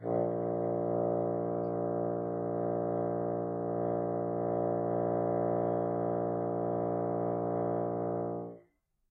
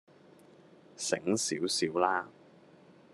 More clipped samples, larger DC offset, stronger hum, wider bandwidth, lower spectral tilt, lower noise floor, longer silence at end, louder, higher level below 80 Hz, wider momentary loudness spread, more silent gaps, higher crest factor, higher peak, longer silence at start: neither; neither; neither; second, 2.4 kHz vs 12.5 kHz; first, -13 dB/octave vs -3 dB/octave; first, -70 dBFS vs -58 dBFS; second, 0.5 s vs 0.85 s; about the same, -33 LUFS vs -31 LUFS; first, -72 dBFS vs -78 dBFS; second, 3 LU vs 8 LU; neither; second, 14 dB vs 24 dB; second, -18 dBFS vs -12 dBFS; second, 0 s vs 1 s